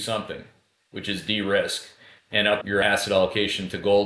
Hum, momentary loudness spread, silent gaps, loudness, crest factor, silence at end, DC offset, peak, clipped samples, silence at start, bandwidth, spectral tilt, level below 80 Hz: none; 12 LU; none; -24 LUFS; 18 dB; 0 s; under 0.1%; -6 dBFS; under 0.1%; 0 s; 11 kHz; -3.5 dB/octave; -56 dBFS